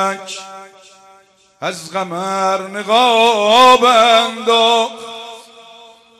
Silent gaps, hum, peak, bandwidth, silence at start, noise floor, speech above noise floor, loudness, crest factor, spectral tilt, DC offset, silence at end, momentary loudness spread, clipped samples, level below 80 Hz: none; none; -2 dBFS; 14 kHz; 0 s; -50 dBFS; 36 dB; -12 LUFS; 14 dB; -2.5 dB/octave; under 0.1%; 0.8 s; 21 LU; under 0.1%; -60 dBFS